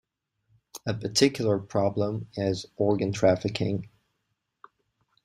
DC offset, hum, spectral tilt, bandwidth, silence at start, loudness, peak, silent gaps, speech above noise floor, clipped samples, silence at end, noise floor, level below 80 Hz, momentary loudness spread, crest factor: under 0.1%; none; -5 dB/octave; 16 kHz; 0.75 s; -27 LUFS; -8 dBFS; none; 53 dB; under 0.1%; 1.4 s; -79 dBFS; -60 dBFS; 10 LU; 22 dB